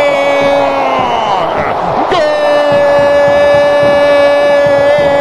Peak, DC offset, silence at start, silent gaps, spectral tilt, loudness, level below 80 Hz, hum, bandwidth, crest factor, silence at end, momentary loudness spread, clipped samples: 0 dBFS; under 0.1%; 0 s; none; -5 dB/octave; -9 LUFS; -40 dBFS; none; 11 kHz; 8 dB; 0 s; 5 LU; under 0.1%